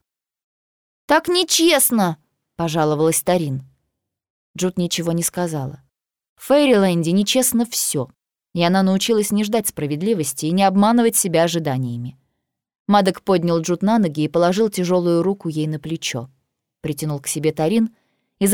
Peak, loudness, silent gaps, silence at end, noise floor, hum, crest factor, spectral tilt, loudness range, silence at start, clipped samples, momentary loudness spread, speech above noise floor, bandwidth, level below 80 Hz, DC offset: -2 dBFS; -18 LUFS; 4.30-4.54 s, 6.29-6.36 s, 12.80-12.85 s; 0 s; -76 dBFS; none; 16 dB; -4.5 dB/octave; 4 LU; 1.1 s; under 0.1%; 12 LU; 58 dB; over 20 kHz; -58 dBFS; under 0.1%